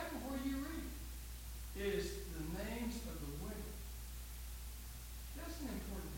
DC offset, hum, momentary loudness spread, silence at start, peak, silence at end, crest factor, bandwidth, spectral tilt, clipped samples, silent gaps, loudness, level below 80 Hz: under 0.1%; none; 8 LU; 0 s; -28 dBFS; 0 s; 16 dB; 17 kHz; -5 dB/octave; under 0.1%; none; -46 LUFS; -50 dBFS